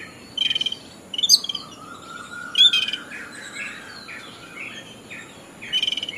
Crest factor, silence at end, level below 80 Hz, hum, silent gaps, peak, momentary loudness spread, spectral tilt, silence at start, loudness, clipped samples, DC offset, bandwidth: 24 dB; 0 s; -64 dBFS; none; none; -2 dBFS; 23 LU; 1 dB/octave; 0 s; -19 LUFS; under 0.1%; under 0.1%; 14 kHz